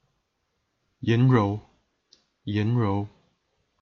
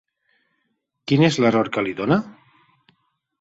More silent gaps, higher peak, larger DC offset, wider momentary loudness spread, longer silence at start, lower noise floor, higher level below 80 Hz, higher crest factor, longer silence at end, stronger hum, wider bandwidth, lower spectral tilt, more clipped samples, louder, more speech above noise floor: neither; second, -8 dBFS vs -4 dBFS; neither; about the same, 16 LU vs 14 LU; about the same, 1 s vs 1.05 s; about the same, -76 dBFS vs -73 dBFS; about the same, -62 dBFS vs -58 dBFS; about the same, 18 dB vs 20 dB; second, 0.75 s vs 1.1 s; neither; second, 6.4 kHz vs 8 kHz; first, -9 dB/octave vs -6.5 dB/octave; neither; second, -25 LUFS vs -20 LUFS; about the same, 53 dB vs 54 dB